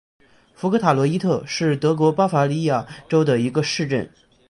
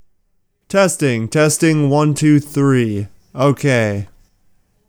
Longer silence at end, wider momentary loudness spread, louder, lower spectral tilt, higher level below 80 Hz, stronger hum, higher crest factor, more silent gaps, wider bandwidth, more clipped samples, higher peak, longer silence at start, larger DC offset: second, 0.45 s vs 0.85 s; second, 7 LU vs 10 LU; second, -20 LUFS vs -15 LUFS; about the same, -6.5 dB/octave vs -5.5 dB/octave; second, -58 dBFS vs -52 dBFS; neither; about the same, 18 dB vs 14 dB; neither; second, 11.5 kHz vs over 20 kHz; neither; about the same, -2 dBFS vs -2 dBFS; about the same, 0.6 s vs 0.7 s; neither